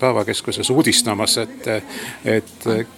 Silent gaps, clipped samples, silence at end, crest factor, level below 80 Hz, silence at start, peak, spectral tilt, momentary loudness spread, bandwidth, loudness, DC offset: none; under 0.1%; 0.05 s; 18 dB; -56 dBFS; 0 s; -2 dBFS; -3 dB/octave; 10 LU; 17 kHz; -19 LUFS; under 0.1%